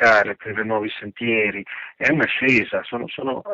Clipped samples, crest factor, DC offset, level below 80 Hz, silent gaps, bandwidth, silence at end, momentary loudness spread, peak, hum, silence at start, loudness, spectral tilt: under 0.1%; 14 dB; under 0.1%; -58 dBFS; none; 7.8 kHz; 0 s; 12 LU; -6 dBFS; none; 0 s; -21 LUFS; -5.5 dB/octave